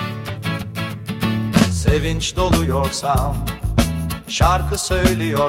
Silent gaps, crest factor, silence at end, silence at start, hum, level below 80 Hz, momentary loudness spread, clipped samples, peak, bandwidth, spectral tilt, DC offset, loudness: none; 18 dB; 0 s; 0 s; none; -26 dBFS; 9 LU; under 0.1%; -2 dBFS; 16.5 kHz; -5 dB/octave; under 0.1%; -19 LUFS